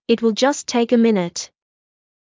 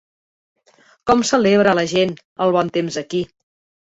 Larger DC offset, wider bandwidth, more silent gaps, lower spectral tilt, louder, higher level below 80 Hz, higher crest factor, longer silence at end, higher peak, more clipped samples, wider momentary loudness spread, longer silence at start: neither; about the same, 7.6 kHz vs 8 kHz; second, none vs 2.25-2.36 s; about the same, -4.5 dB/octave vs -4.5 dB/octave; about the same, -18 LUFS vs -18 LUFS; second, -66 dBFS vs -52 dBFS; about the same, 16 dB vs 18 dB; first, 0.85 s vs 0.6 s; about the same, -4 dBFS vs -2 dBFS; neither; about the same, 13 LU vs 11 LU; second, 0.1 s vs 1.05 s